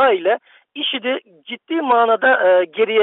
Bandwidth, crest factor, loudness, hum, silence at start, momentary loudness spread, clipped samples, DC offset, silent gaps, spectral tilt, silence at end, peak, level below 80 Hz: 4.1 kHz; 12 dB; -17 LUFS; none; 0 s; 15 LU; under 0.1%; under 0.1%; none; 0.5 dB/octave; 0 s; -6 dBFS; -66 dBFS